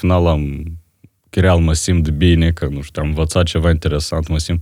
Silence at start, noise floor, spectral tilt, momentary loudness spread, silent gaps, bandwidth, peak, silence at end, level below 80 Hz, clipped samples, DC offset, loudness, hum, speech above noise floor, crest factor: 0 s; -52 dBFS; -6 dB/octave; 10 LU; none; 13 kHz; -2 dBFS; 0 s; -28 dBFS; under 0.1%; under 0.1%; -16 LUFS; none; 37 dB; 14 dB